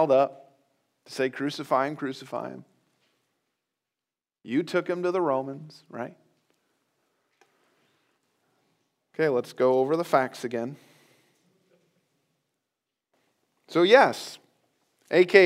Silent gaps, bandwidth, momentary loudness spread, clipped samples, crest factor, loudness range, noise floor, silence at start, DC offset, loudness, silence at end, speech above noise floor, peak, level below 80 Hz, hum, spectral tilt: none; 15.5 kHz; 21 LU; under 0.1%; 26 dB; 12 LU; under -90 dBFS; 0 s; under 0.1%; -25 LUFS; 0 s; over 66 dB; -2 dBFS; -86 dBFS; none; -5.5 dB/octave